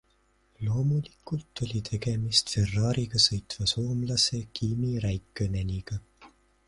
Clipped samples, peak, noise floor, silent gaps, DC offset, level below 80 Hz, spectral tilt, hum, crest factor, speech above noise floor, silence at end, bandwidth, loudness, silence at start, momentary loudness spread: under 0.1%; -8 dBFS; -67 dBFS; none; under 0.1%; -46 dBFS; -4.5 dB/octave; none; 22 dB; 39 dB; 0.4 s; 11.5 kHz; -28 LUFS; 0.6 s; 12 LU